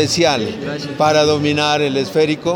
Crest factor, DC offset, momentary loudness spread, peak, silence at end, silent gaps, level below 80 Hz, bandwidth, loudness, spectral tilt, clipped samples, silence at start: 14 dB; under 0.1%; 9 LU; -2 dBFS; 0 s; none; -50 dBFS; 19 kHz; -16 LUFS; -4.5 dB/octave; under 0.1%; 0 s